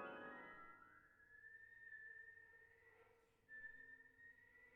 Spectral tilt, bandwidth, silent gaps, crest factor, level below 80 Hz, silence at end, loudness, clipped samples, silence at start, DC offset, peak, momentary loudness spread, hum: -2 dB/octave; 4 kHz; none; 20 dB; -84 dBFS; 0 s; -60 LUFS; under 0.1%; 0 s; under 0.1%; -42 dBFS; 11 LU; none